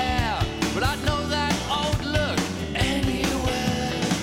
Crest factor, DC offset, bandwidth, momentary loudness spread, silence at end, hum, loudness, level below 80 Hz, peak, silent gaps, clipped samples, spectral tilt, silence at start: 16 dB; under 0.1%; 17.5 kHz; 2 LU; 0 s; none; -24 LUFS; -34 dBFS; -8 dBFS; none; under 0.1%; -4.5 dB/octave; 0 s